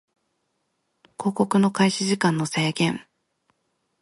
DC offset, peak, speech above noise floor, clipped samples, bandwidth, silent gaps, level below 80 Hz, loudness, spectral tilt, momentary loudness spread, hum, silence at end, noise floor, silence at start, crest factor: under 0.1%; -6 dBFS; 53 dB; under 0.1%; 11.5 kHz; none; -68 dBFS; -22 LUFS; -5 dB/octave; 8 LU; none; 1 s; -74 dBFS; 1.2 s; 20 dB